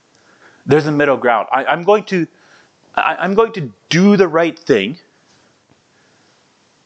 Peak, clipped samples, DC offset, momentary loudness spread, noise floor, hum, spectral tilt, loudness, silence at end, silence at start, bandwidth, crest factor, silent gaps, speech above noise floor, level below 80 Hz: 0 dBFS; under 0.1%; under 0.1%; 12 LU; -54 dBFS; none; -6 dB/octave; -15 LUFS; 1.9 s; 0.65 s; 8.2 kHz; 16 dB; none; 40 dB; -58 dBFS